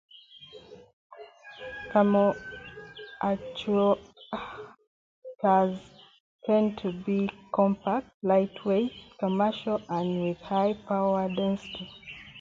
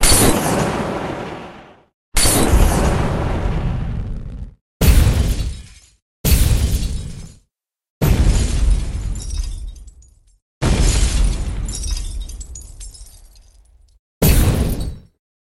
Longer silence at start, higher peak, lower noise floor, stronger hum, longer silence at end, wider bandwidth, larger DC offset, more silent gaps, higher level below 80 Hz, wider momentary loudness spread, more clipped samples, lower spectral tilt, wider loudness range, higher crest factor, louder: first, 0.35 s vs 0 s; second, -10 dBFS vs 0 dBFS; second, -50 dBFS vs -67 dBFS; neither; second, 0 s vs 0.45 s; second, 7.4 kHz vs 16 kHz; neither; second, 0.93-1.10 s, 4.87-5.22 s, 6.20-6.39 s, 8.14-8.20 s vs 1.94-2.12 s, 4.61-4.80 s, 6.02-6.24 s, 7.90-8.01 s, 10.42-10.61 s, 13.99-14.21 s; second, -62 dBFS vs -20 dBFS; about the same, 19 LU vs 20 LU; neither; first, -8 dB/octave vs -4.5 dB/octave; about the same, 2 LU vs 4 LU; about the same, 20 dB vs 18 dB; second, -28 LUFS vs -18 LUFS